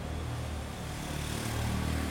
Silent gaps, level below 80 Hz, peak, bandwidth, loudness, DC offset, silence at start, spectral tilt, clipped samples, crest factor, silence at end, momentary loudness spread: none; -42 dBFS; -20 dBFS; 18 kHz; -35 LUFS; under 0.1%; 0 s; -5 dB/octave; under 0.1%; 14 dB; 0 s; 6 LU